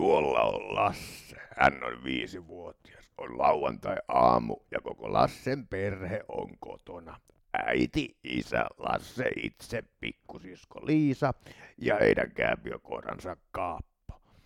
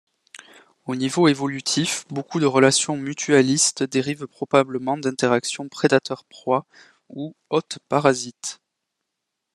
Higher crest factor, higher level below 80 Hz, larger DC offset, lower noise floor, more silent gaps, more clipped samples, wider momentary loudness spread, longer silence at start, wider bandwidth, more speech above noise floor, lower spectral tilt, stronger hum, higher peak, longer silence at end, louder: about the same, 24 dB vs 22 dB; first, -54 dBFS vs -68 dBFS; neither; second, -50 dBFS vs -81 dBFS; neither; neither; first, 20 LU vs 14 LU; second, 0 s vs 0.35 s; first, 15.5 kHz vs 12.5 kHz; second, 19 dB vs 59 dB; first, -6 dB/octave vs -4 dB/octave; neither; second, -6 dBFS vs 0 dBFS; second, 0.3 s vs 1 s; second, -30 LUFS vs -21 LUFS